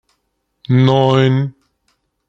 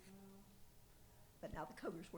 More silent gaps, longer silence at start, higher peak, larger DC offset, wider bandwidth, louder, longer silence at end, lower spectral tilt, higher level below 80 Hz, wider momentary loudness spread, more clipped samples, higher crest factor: neither; first, 0.7 s vs 0 s; first, -2 dBFS vs -34 dBFS; neither; second, 7 kHz vs over 20 kHz; first, -14 LUFS vs -53 LUFS; first, 0.8 s vs 0 s; first, -8 dB/octave vs -5.5 dB/octave; first, -54 dBFS vs -66 dBFS; second, 7 LU vs 18 LU; neither; second, 14 dB vs 20 dB